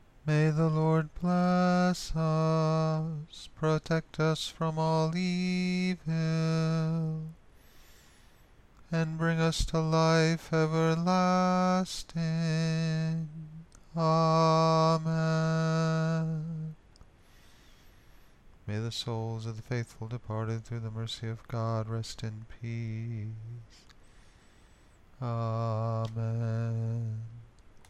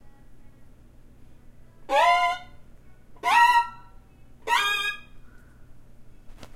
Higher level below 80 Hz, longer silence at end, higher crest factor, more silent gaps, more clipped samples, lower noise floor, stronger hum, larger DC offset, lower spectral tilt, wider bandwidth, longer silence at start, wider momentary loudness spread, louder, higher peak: about the same, -52 dBFS vs -52 dBFS; about the same, 0.1 s vs 0.1 s; about the same, 16 dB vs 20 dB; neither; neither; first, -58 dBFS vs -49 dBFS; neither; neither; first, -6.5 dB/octave vs -1 dB/octave; second, 10.5 kHz vs 16 kHz; first, 0.25 s vs 0.05 s; second, 14 LU vs 17 LU; second, -30 LUFS vs -22 LUFS; second, -16 dBFS vs -8 dBFS